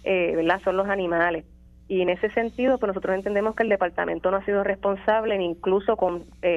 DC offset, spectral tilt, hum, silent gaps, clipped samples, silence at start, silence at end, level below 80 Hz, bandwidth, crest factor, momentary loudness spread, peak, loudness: under 0.1%; -7 dB/octave; none; none; under 0.1%; 0.05 s; 0 s; -50 dBFS; 7.8 kHz; 16 dB; 3 LU; -8 dBFS; -24 LUFS